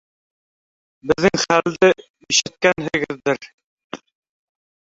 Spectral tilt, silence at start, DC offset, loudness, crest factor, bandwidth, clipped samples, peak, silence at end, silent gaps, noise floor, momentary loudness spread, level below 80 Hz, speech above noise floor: -3 dB/octave; 1.05 s; under 0.1%; -18 LUFS; 20 dB; 8 kHz; under 0.1%; -2 dBFS; 1 s; 2.10-2.14 s, 3.53-3.58 s, 3.64-3.77 s, 3.84-3.90 s; under -90 dBFS; 21 LU; -54 dBFS; over 72 dB